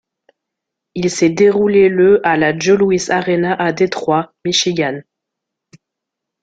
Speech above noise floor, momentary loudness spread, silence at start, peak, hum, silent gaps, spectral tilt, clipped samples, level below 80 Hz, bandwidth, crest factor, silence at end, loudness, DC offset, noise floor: 67 dB; 8 LU; 0.95 s; -2 dBFS; none; none; -4.5 dB/octave; under 0.1%; -54 dBFS; 9 kHz; 14 dB; 1.4 s; -14 LUFS; under 0.1%; -80 dBFS